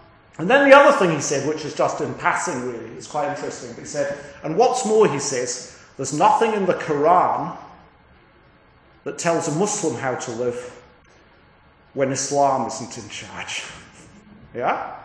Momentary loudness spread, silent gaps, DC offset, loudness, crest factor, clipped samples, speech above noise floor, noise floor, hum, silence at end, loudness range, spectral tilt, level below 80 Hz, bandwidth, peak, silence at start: 17 LU; none; under 0.1%; -20 LUFS; 22 dB; under 0.1%; 33 dB; -53 dBFS; none; 0 s; 8 LU; -4 dB/octave; -60 dBFS; 10.5 kHz; 0 dBFS; 0.4 s